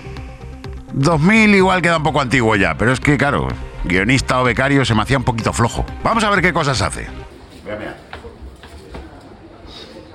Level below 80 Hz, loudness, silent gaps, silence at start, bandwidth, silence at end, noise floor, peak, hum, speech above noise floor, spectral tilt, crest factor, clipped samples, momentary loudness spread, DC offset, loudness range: -32 dBFS; -15 LUFS; none; 0 s; 13 kHz; 0 s; -39 dBFS; 0 dBFS; none; 24 dB; -5.5 dB/octave; 16 dB; under 0.1%; 23 LU; under 0.1%; 8 LU